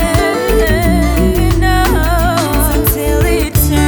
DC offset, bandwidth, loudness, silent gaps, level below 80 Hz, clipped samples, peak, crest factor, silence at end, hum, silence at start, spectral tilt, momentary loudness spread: under 0.1%; over 20 kHz; -12 LUFS; none; -16 dBFS; under 0.1%; 0 dBFS; 12 dB; 0 s; none; 0 s; -5.5 dB/octave; 1 LU